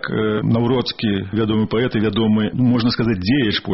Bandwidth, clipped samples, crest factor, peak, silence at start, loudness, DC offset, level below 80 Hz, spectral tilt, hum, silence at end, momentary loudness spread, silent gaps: 6 kHz; under 0.1%; 12 dB; -6 dBFS; 0.05 s; -18 LUFS; under 0.1%; -44 dBFS; -5.5 dB/octave; none; 0 s; 3 LU; none